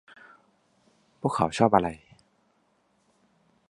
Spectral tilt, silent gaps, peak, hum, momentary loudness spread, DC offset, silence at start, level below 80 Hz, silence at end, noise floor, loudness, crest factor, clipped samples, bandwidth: -6 dB/octave; none; -4 dBFS; none; 12 LU; under 0.1%; 1.25 s; -58 dBFS; 1.75 s; -69 dBFS; -25 LUFS; 26 dB; under 0.1%; 11.5 kHz